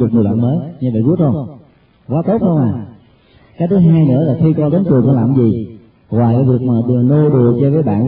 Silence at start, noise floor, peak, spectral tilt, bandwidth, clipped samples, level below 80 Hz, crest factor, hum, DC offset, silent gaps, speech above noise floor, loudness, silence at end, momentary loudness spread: 0 s; -47 dBFS; 0 dBFS; -15.5 dB/octave; 4.1 kHz; under 0.1%; -46 dBFS; 12 dB; none; under 0.1%; none; 35 dB; -13 LUFS; 0 s; 10 LU